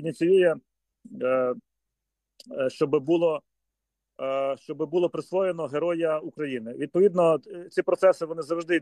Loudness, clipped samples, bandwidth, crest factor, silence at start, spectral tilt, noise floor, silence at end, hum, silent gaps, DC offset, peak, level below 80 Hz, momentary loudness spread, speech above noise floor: -26 LUFS; under 0.1%; 11.5 kHz; 18 dB; 0 s; -6.5 dB/octave; -84 dBFS; 0 s; none; none; under 0.1%; -8 dBFS; -78 dBFS; 11 LU; 59 dB